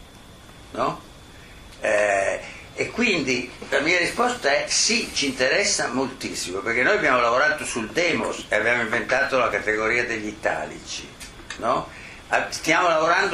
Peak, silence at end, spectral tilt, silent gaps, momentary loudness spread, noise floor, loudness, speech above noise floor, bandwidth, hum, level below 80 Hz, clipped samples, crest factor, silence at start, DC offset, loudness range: -6 dBFS; 0 s; -2 dB/octave; none; 13 LU; -45 dBFS; -22 LUFS; 23 dB; 15 kHz; none; -50 dBFS; under 0.1%; 18 dB; 0 s; under 0.1%; 4 LU